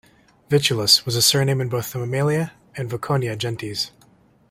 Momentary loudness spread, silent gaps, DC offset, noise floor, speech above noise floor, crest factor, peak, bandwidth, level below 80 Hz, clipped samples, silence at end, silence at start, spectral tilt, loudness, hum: 13 LU; none; under 0.1%; -55 dBFS; 35 dB; 20 dB; -2 dBFS; 16 kHz; -56 dBFS; under 0.1%; 0.6 s; 0.5 s; -3.5 dB/octave; -20 LUFS; none